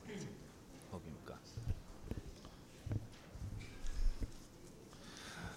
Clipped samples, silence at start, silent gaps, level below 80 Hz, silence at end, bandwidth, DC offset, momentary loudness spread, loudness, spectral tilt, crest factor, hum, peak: under 0.1%; 0 s; none; -48 dBFS; 0 s; 15.5 kHz; under 0.1%; 12 LU; -50 LUFS; -5.5 dB/octave; 20 dB; none; -24 dBFS